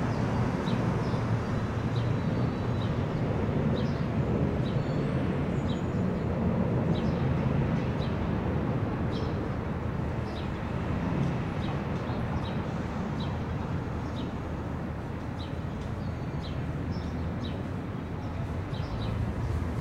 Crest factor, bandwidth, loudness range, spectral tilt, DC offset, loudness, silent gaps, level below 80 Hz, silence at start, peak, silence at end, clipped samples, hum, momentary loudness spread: 14 dB; 9.8 kHz; 6 LU; -8 dB/octave; under 0.1%; -31 LUFS; none; -42 dBFS; 0 s; -16 dBFS; 0 s; under 0.1%; none; 7 LU